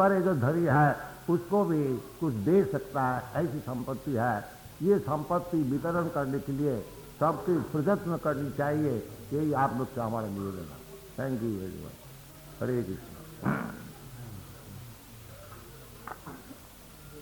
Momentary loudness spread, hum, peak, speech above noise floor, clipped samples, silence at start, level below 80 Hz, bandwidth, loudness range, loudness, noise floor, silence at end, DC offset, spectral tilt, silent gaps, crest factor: 21 LU; none; -12 dBFS; 21 dB; under 0.1%; 0 s; -56 dBFS; 19.5 kHz; 11 LU; -30 LUFS; -50 dBFS; 0 s; under 0.1%; -7.5 dB/octave; none; 18 dB